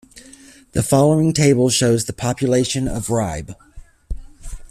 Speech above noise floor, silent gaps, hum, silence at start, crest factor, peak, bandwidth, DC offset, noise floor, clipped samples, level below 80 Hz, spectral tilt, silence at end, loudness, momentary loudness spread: 28 dB; none; none; 0.15 s; 16 dB; -2 dBFS; 15 kHz; under 0.1%; -45 dBFS; under 0.1%; -38 dBFS; -5 dB/octave; 0.05 s; -17 LUFS; 21 LU